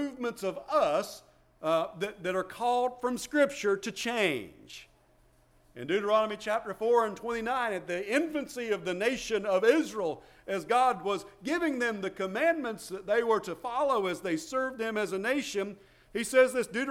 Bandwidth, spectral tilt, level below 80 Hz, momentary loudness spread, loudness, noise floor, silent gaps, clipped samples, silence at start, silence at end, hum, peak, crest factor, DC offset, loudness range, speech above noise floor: 16.5 kHz; -4 dB/octave; -64 dBFS; 10 LU; -30 LUFS; -64 dBFS; none; under 0.1%; 0 s; 0 s; none; -12 dBFS; 18 dB; under 0.1%; 2 LU; 34 dB